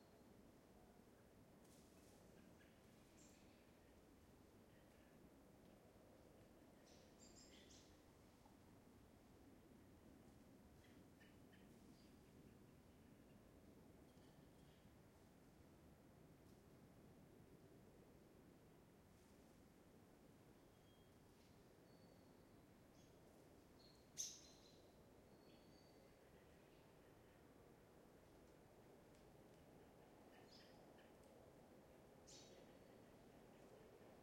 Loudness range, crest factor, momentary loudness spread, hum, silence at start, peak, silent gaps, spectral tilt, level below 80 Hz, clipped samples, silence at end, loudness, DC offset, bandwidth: 9 LU; 32 dB; 4 LU; none; 0 s; -36 dBFS; none; -3.5 dB/octave; -80 dBFS; under 0.1%; 0 s; -66 LUFS; under 0.1%; 16 kHz